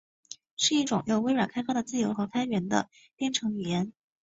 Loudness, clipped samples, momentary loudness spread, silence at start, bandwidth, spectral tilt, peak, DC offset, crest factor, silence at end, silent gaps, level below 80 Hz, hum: -29 LUFS; under 0.1%; 13 LU; 0.3 s; 8 kHz; -4 dB/octave; -8 dBFS; under 0.1%; 20 dB; 0.3 s; 0.51-0.57 s; -66 dBFS; none